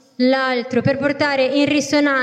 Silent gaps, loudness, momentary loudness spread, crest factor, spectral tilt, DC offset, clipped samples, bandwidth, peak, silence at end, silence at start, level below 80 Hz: none; -17 LUFS; 3 LU; 12 dB; -4.5 dB/octave; under 0.1%; under 0.1%; 10.5 kHz; -6 dBFS; 0 s; 0.2 s; -62 dBFS